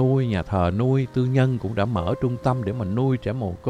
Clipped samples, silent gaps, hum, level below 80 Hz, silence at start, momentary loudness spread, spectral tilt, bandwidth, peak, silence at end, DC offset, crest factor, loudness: under 0.1%; none; none; -44 dBFS; 0 s; 5 LU; -9 dB/octave; 8.8 kHz; -6 dBFS; 0 s; under 0.1%; 16 dB; -23 LUFS